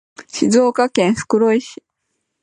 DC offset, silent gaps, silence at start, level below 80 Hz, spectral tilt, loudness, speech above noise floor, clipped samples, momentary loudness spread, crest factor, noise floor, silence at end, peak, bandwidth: under 0.1%; none; 0.2 s; -56 dBFS; -5 dB/octave; -16 LUFS; 57 dB; under 0.1%; 10 LU; 16 dB; -73 dBFS; 0.7 s; 0 dBFS; 11 kHz